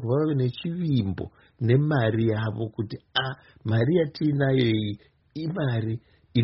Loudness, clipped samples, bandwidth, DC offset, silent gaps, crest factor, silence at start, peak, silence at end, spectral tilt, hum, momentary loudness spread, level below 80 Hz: -26 LUFS; under 0.1%; 5.8 kHz; under 0.1%; none; 16 dB; 0 s; -8 dBFS; 0 s; -6 dB/octave; none; 12 LU; -56 dBFS